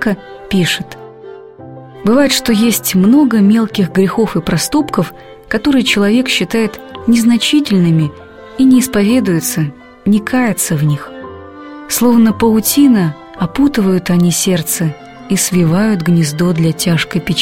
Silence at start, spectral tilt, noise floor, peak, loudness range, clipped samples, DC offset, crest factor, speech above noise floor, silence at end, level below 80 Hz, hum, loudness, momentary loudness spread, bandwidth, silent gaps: 0 s; -5 dB/octave; -33 dBFS; 0 dBFS; 2 LU; under 0.1%; 0.4%; 12 dB; 21 dB; 0 s; -42 dBFS; none; -12 LUFS; 11 LU; 16.5 kHz; none